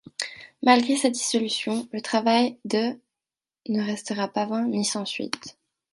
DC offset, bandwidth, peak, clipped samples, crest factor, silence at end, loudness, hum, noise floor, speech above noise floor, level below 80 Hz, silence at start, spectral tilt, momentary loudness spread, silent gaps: under 0.1%; 11.5 kHz; -4 dBFS; under 0.1%; 22 dB; 0.4 s; -25 LUFS; none; under -90 dBFS; over 66 dB; -74 dBFS; 0.2 s; -3.5 dB/octave; 13 LU; none